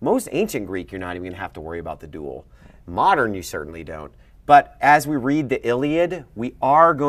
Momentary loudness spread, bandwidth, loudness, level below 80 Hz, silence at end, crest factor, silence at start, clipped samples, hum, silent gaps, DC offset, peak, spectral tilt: 19 LU; 15.5 kHz; -20 LUFS; -48 dBFS; 0 s; 20 dB; 0 s; under 0.1%; none; none; under 0.1%; 0 dBFS; -5.5 dB/octave